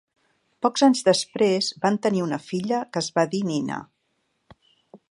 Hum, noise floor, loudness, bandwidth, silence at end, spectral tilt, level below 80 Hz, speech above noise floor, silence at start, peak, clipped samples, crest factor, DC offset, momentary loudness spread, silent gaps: none; -73 dBFS; -23 LUFS; 11.5 kHz; 0.15 s; -4.5 dB/octave; -68 dBFS; 50 dB; 0.6 s; -6 dBFS; under 0.1%; 20 dB; under 0.1%; 9 LU; none